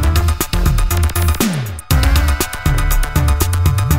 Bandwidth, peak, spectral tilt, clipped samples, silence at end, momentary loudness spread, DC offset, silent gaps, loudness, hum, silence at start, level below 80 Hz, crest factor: 16.5 kHz; -2 dBFS; -4.5 dB/octave; under 0.1%; 0 s; 3 LU; 0.7%; none; -16 LUFS; none; 0 s; -16 dBFS; 12 dB